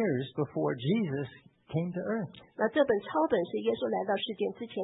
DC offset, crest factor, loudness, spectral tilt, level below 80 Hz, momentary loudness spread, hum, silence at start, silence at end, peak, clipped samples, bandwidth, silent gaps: under 0.1%; 18 dB; -31 LUFS; -10.5 dB/octave; -70 dBFS; 8 LU; none; 0 s; 0 s; -14 dBFS; under 0.1%; 4 kHz; none